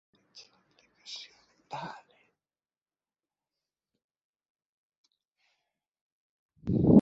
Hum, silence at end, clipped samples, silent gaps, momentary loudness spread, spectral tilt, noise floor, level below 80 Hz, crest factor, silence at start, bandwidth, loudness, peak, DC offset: none; 0 s; under 0.1%; 2.82-2.86 s, 4.04-4.09 s, 4.24-4.34 s, 4.50-4.55 s, 4.66-4.90 s, 4.97-5.04 s, 6.01-6.49 s; 26 LU; -8 dB/octave; under -90 dBFS; -56 dBFS; 26 dB; 1.1 s; 7.6 kHz; -32 LUFS; -8 dBFS; under 0.1%